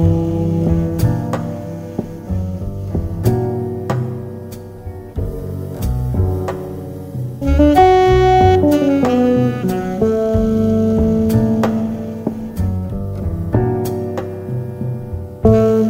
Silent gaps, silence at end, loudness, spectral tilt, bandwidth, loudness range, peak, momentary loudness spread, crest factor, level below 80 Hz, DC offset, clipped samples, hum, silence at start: none; 0 s; -17 LUFS; -8 dB/octave; 16 kHz; 9 LU; 0 dBFS; 15 LU; 16 dB; -28 dBFS; under 0.1%; under 0.1%; none; 0 s